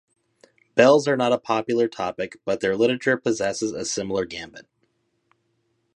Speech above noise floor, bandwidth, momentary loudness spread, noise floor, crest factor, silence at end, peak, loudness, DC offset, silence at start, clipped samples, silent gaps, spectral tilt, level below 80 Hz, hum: 49 dB; 10.5 kHz; 12 LU; -71 dBFS; 20 dB; 1.35 s; -2 dBFS; -22 LUFS; under 0.1%; 0.75 s; under 0.1%; none; -4 dB/octave; -62 dBFS; none